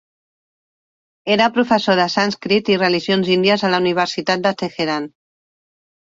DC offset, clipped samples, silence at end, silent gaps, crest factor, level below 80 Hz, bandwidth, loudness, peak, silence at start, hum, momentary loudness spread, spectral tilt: under 0.1%; under 0.1%; 1.05 s; none; 16 dB; -60 dBFS; 7.8 kHz; -17 LUFS; -2 dBFS; 1.25 s; none; 7 LU; -5 dB/octave